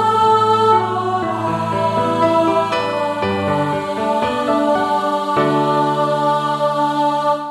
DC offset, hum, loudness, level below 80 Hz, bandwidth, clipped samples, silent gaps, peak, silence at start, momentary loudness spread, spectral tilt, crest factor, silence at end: under 0.1%; none; -17 LUFS; -54 dBFS; 13.5 kHz; under 0.1%; none; -4 dBFS; 0 s; 6 LU; -6 dB/octave; 14 dB; 0 s